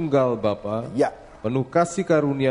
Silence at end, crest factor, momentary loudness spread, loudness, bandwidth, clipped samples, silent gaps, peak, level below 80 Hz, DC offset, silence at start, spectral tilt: 0 s; 16 dB; 7 LU; -23 LUFS; 10.5 kHz; under 0.1%; none; -6 dBFS; -54 dBFS; under 0.1%; 0 s; -6.5 dB/octave